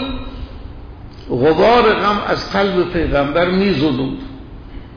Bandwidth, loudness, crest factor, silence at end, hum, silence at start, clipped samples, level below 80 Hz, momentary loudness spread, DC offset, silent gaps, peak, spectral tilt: 5.4 kHz; -15 LUFS; 12 dB; 0 s; none; 0 s; under 0.1%; -32 dBFS; 24 LU; under 0.1%; none; -4 dBFS; -7 dB/octave